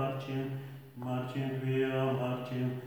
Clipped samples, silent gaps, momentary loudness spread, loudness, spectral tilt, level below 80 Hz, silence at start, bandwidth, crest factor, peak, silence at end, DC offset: under 0.1%; none; 11 LU; -35 LUFS; -8 dB/octave; -72 dBFS; 0 s; over 20 kHz; 14 dB; -20 dBFS; 0 s; under 0.1%